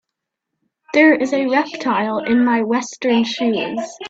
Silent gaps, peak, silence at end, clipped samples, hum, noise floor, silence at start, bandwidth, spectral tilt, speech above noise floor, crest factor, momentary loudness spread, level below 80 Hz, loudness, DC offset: none; -2 dBFS; 0 s; under 0.1%; none; -80 dBFS; 0.9 s; 8 kHz; -4.5 dB/octave; 64 dB; 16 dB; 7 LU; -62 dBFS; -17 LUFS; under 0.1%